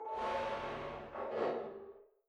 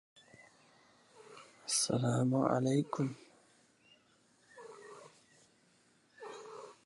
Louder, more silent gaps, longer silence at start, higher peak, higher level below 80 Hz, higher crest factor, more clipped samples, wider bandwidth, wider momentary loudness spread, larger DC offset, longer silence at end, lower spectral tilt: second, -40 LUFS vs -34 LUFS; neither; second, 0 s vs 1.2 s; second, -24 dBFS vs -14 dBFS; first, -66 dBFS vs -76 dBFS; second, 16 dB vs 24 dB; neither; about the same, 10.5 kHz vs 11.5 kHz; second, 11 LU vs 24 LU; neither; about the same, 0.25 s vs 0.15 s; about the same, -5.5 dB/octave vs -5 dB/octave